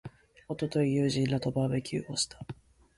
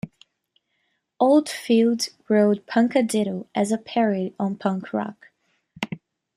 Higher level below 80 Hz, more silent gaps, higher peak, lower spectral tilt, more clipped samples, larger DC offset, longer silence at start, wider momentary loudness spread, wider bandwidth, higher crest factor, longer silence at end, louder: first, -60 dBFS vs -68 dBFS; neither; second, -16 dBFS vs -6 dBFS; about the same, -5.5 dB/octave vs -5.5 dB/octave; neither; neither; about the same, 0.05 s vs 0.05 s; first, 18 LU vs 14 LU; second, 11.5 kHz vs 14 kHz; about the same, 14 dB vs 18 dB; about the same, 0.45 s vs 0.4 s; second, -30 LUFS vs -22 LUFS